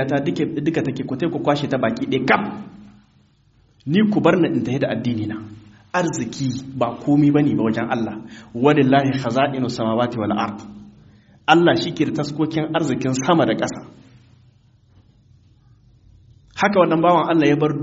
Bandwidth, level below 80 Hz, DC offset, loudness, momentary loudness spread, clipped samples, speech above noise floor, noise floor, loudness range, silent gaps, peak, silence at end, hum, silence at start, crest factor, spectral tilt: 8 kHz; -56 dBFS; under 0.1%; -19 LUFS; 12 LU; under 0.1%; 38 dB; -57 dBFS; 5 LU; none; 0 dBFS; 0 s; none; 0 s; 20 dB; -5.5 dB/octave